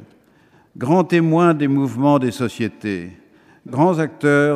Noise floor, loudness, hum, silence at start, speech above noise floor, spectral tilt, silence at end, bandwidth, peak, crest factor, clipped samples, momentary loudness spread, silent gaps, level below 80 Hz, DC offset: -54 dBFS; -18 LUFS; none; 0 s; 37 dB; -7.5 dB/octave; 0 s; 13.5 kHz; -2 dBFS; 16 dB; under 0.1%; 12 LU; none; -64 dBFS; under 0.1%